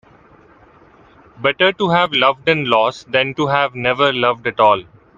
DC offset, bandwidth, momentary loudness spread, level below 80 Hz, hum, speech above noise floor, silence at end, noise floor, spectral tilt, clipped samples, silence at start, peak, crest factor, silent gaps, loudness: under 0.1%; 7.6 kHz; 4 LU; -56 dBFS; none; 32 dB; 0.35 s; -47 dBFS; -5.5 dB/octave; under 0.1%; 1.4 s; 0 dBFS; 18 dB; none; -16 LUFS